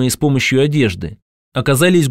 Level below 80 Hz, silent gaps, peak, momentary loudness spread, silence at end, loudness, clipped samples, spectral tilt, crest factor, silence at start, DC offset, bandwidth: -42 dBFS; 1.22-1.52 s; -2 dBFS; 14 LU; 0 s; -15 LUFS; under 0.1%; -5 dB/octave; 14 dB; 0 s; under 0.1%; 16 kHz